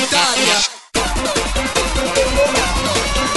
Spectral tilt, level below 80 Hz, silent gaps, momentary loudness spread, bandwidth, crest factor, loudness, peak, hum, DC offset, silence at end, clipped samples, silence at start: -2 dB/octave; -26 dBFS; none; 5 LU; 12 kHz; 16 dB; -16 LUFS; -2 dBFS; none; 0.8%; 0 s; under 0.1%; 0 s